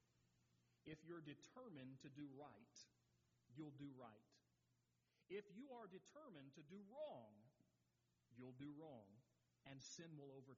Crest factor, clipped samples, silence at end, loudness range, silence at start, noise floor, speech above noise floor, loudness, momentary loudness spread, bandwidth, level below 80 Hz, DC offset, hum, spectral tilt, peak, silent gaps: 20 dB; under 0.1%; 0 s; 2 LU; 0 s; -87 dBFS; 27 dB; -61 LUFS; 8 LU; 7.4 kHz; under -90 dBFS; under 0.1%; none; -5.5 dB/octave; -42 dBFS; none